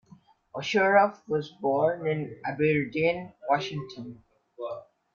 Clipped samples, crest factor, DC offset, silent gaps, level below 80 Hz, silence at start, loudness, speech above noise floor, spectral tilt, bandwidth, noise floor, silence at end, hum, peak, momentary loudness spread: under 0.1%; 20 dB; under 0.1%; none; -66 dBFS; 0.55 s; -27 LUFS; 30 dB; -6 dB/octave; 7.2 kHz; -57 dBFS; 0.35 s; none; -8 dBFS; 19 LU